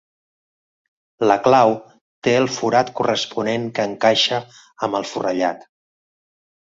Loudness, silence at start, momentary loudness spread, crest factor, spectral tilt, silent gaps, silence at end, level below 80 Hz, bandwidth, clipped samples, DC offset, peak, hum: -19 LUFS; 1.2 s; 10 LU; 20 dB; -4 dB/octave; 2.01-2.22 s; 1.1 s; -62 dBFS; 7.8 kHz; under 0.1%; under 0.1%; -2 dBFS; none